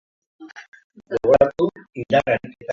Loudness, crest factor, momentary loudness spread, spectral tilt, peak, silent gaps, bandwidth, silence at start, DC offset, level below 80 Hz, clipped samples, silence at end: -20 LUFS; 20 dB; 20 LU; -7 dB/octave; -2 dBFS; 0.68-0.72 s, 0.84-0.90 s; 7.4 kHz; 0.4 s; under 0.1%; -52 dBFS; under 0.1%; 0 s